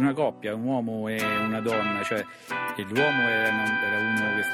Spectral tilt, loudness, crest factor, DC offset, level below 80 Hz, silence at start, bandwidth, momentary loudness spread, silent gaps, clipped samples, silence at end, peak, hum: -5 dB/octave; -26 LUFS; 16 dB; under 0.1%; -66 dBFS; 0 s; 16 kHz; 8 LU; none; under 0.1%; 0 s; -10 dBFS; none